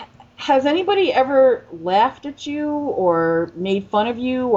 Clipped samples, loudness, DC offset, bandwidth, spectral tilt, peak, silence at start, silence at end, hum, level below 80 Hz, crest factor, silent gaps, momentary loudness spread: under 0.1%; -19 LUFS; under 0.1%; 7.6 kHz; -6 dB/octave; -6 dBFS; 0 s; 0 s; none; -56 dBFS; 14 dB; none; 9 LU